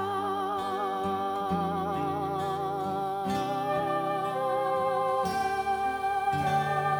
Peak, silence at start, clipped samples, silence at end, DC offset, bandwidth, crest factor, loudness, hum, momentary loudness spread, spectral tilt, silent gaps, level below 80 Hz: -16 dBFS; 0 s; under 0.1%; 0 s; under 0.1%; over 20 kHz; 12 dB; -29 LUFS; none; 4 LU; -6 dB/octave; none; -60 dBFS